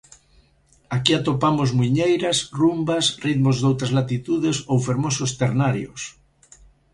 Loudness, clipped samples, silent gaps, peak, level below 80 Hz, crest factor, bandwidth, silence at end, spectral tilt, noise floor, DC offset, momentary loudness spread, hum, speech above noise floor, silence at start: -21 LUFS; under 0.1%; none; 0 dBFS; -52 dBFS; 22 dB; 11.5 kHz; 0.85 s; -5 dB/octave; -58 dBFS; under 0.1%; 4 LU; none; 38 dB; 0.9 s